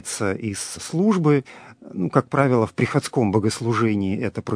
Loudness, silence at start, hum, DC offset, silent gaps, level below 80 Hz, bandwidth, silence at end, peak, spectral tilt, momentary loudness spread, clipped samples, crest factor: -22 LUFS; 0.05 s; none; under 0.1%; none; -58 dBFS; 11 kHz; 0 s; 0 dBFS; -6 dB/octave; 9 LU; under 0.1%; 22 dB